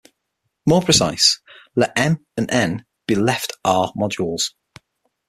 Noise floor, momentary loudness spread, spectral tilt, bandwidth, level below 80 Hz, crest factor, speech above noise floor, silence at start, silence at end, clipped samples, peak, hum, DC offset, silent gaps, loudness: -75 dBFS; 10 LU; -3.5 dB/octave; 15 kHz; -52 dBFS; 20 dB; 56 dB; 0.65 s; 0.8 s; under 0.1%; 0 dBFS; none; under 0.1%; none; -19 LUFS